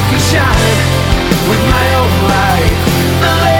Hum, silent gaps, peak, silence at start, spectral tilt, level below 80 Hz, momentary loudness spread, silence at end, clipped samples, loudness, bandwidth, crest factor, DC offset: none; none; 0 dBFS; 0 s; -5 dB/octave; -20 dBFS; 2 LU; 0 s; under 0.1%; -11 LUFS; 19 kHz; 10 dB; under 0.1%